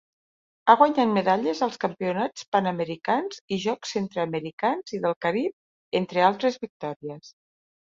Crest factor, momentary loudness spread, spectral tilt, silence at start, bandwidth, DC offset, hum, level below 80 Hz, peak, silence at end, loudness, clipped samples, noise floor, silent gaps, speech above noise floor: 24 dB; 13 LU; -5.5 dB/octave; 0.65 s; 7.8 kHz; under 0.1%; none; -70 dBFS; -2 dBFS; 0.65 s; -25 LUFS; under 0.1%; under -90 dBFS; 2.48-2.52 s, 3.41-3.48 s, 4.53-4.58 s, 5.16-5.21 s, 5.53-5.91 s, 6.70-6.80 s, 6.96-7.00 s; over 65 dB